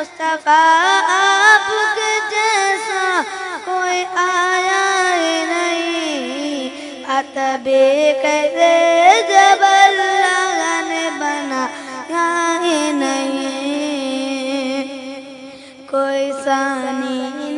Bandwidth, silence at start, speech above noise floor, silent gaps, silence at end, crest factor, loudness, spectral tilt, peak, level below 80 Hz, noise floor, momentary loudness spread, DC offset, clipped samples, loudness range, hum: 11 kHz; 0 s; 23 dB; none; 0 s; 16 dB; -15 LUFS; -0.5 dB/octave; 0 dBFS; -68 dBFS; -36 dBFS; 13 LU; under 0.1%; under 0.1%; 9 LU; none